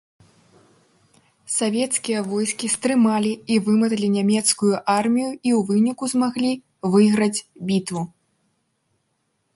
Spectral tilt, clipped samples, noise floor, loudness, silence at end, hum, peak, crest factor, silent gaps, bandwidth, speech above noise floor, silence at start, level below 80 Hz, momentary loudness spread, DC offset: -4.5 dB/octave; under 0.1%; -71 dBFS; -21 LUFS; 1.5 s; none; -6 dBFS; 16 dB; none; 11.5 kHz; 51 dB; 1.5 s; -66 dBFS; 7 LU; under 0.1%